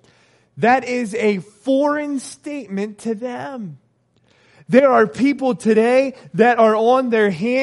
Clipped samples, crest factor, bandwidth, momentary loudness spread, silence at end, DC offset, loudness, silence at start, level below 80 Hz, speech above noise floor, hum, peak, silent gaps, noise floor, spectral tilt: under 0.1%; 18 dB; 11.5 kHz; 14 LU; 0 s; under 0.1%; -17 LUFS; 0.55 s; -68 dBFS; 43 dB; none; 0 dBFS; none; -60 dBFS; -6 dB/octave